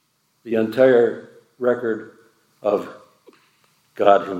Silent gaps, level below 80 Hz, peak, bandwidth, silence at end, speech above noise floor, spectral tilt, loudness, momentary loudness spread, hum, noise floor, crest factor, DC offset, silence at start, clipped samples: none; -76 dBFS; -2 dBFS; 13 kHz; 0 s; 43 dB; -7 dB/octave; -20 LUFS; 14 LU; none; -61 dBFS; 20 dB; under 0.1%; 0.45 s; under 0.1%